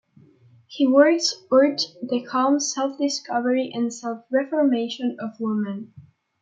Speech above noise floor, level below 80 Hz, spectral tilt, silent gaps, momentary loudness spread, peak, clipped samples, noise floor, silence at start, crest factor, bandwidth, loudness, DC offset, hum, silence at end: 32 dB; -76 dBFS; -3.5 dB/octave; none; 11 LU; -4 dBFS; under 0.1%; -54 dBFS; 0.7 s; 18 dB; 9 kHz; -22 LUFS; under 0.1%; none; 0.4 s